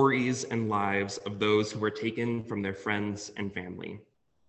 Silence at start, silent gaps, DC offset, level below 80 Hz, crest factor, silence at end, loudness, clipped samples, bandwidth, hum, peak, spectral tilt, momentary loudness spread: 0 s; none; under 0.1%; -62 dBFS; 20 dB; 0.45 s; -30 LUFS; under 0.1%; 8.6 kHz; none; -12 dBFS; -5 dB/octave; 12 LU